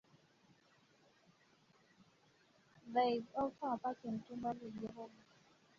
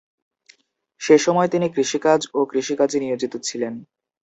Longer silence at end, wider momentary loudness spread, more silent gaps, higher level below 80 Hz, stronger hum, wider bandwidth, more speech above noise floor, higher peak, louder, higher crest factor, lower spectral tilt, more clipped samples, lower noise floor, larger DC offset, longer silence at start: first, 0.7 s vs 0.4 s; first, 16 LU vs 12 LU; neither; second, -80 dBFS vs -68 dBFS; neither; second, 7.4 kHz vs 8.2 kHz; second, 31 dB vs 41 dB; second, -24 dBFS vs -2 dBFS; second, -41 LUFS vs -20 LUFS; about the same, 22 dB vs 20 dB; about the same, -4.5 dB/octave vs -4.5 dB/octave; neither; first, -72 dBFS vs -61 dBFS; neither; first, 2.85 s vs 1 s